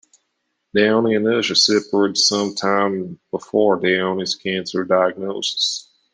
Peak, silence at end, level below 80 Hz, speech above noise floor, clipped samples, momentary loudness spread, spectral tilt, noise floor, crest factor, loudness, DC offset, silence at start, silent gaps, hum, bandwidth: -2 dBFS; 0.3 s; -66 dBFS; 55 dB; under 0.1%; 8 LU; -3 dB/octave; -73 dBFS; 18 dB; -18 LUFS; under 0.1%; 0.75 s; none; none; 10 kHz